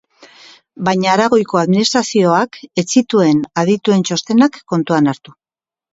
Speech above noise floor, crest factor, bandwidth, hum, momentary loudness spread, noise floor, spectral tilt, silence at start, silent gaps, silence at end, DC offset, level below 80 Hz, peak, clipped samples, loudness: over 76 dB; 14 dB; 8 kHz; none; 6 LU; under -90 dBFS; -5 dB/octave; 0.8 s; none; 0.75 s; under 0.1%; -60 dBFS; 0 dBFS; under 0.1%; -14 LUFS